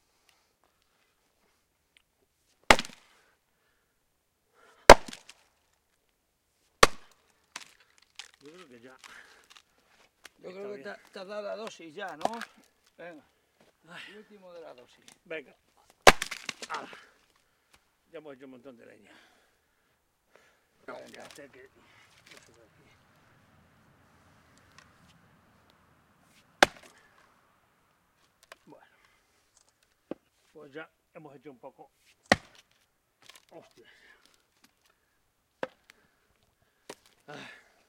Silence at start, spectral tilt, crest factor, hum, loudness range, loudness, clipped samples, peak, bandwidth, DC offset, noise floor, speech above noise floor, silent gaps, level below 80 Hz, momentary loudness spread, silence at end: 2.7 s; -2.5 dB/octave; 34 dB; none; 27 LU; -25 LUFS; under 0.1%; 0 dBFS; 16.5 kHz; under 0.1%; -75 dBFS; 31 dB; none; -48 dBFS; 30 LU; 5.5 s